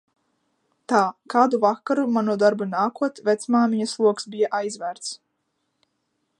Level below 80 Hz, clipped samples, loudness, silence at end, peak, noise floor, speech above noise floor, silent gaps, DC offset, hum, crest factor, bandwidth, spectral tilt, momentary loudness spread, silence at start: -78 dBFS; under 0.1%; -22 LUFS; 1.25 s; -4 dBFS; -74 dBFS; 53 dB; none; under 0.1%; none; 20 dB; 11 kHz; -5 dB/octave; 10 LU; 0.9 s